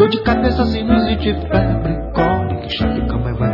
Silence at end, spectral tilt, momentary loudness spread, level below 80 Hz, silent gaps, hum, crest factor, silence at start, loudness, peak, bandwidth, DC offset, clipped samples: 0 s; -9 dB/octave; 5 LU; -26 dBFS; none; none; 16 dB; 0 s; -17 LUFS; 0 dBFS; 5.8 kHz; under 0.1%; under 0.1%